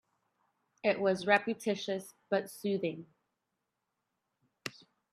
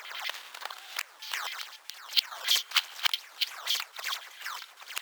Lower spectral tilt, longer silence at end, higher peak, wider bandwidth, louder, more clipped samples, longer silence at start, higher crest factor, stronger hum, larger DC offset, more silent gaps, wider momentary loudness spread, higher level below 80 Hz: first, -5 dB/octave vs 6.5 dB/octave; first, 0.45 s vs 0 s; about the same, -10 dBFS vs -8 dBFS; second, 14 kHz vs over 20 kHz; about the same, -33 LUFS vs -31 LUFS; neither; first, 0.85 s vs 0 s; about the same, 26 dB vs 26 dB; neither; neither; neither; about the same, 16 LU vs 14 LU; first, -82 dBFS vs under -90 dBFS